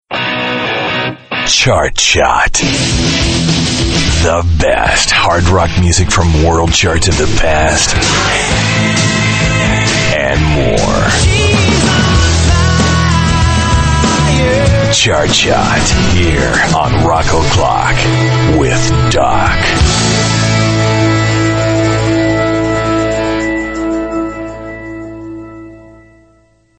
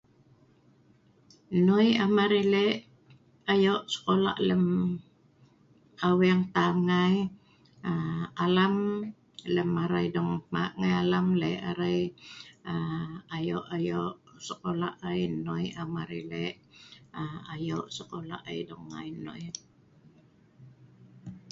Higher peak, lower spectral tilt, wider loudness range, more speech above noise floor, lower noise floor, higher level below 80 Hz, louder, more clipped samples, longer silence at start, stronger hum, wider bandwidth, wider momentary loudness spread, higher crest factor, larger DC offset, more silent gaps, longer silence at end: first, 0 dBFS vs -12 dBFS; second, -4 dB/octave vs -6.5 dB/octave; second, 3 LU vs 12 LU; first, 40 dB vs 34 dB; second, -50 dBFS vs -62 dBFS; first, -20 dBFS vs -62 dBFS; first, -10 LUFS vs -29 LUFS; neither; second, 0.1 s vs 1.5 s; neither; first, 9.2 kHz vs 7.8 kHz; second, 6 LU vs 16 LU; second, 10 dB vs 18 dB; neither; neither; first, 0.95 s vs 0.15 s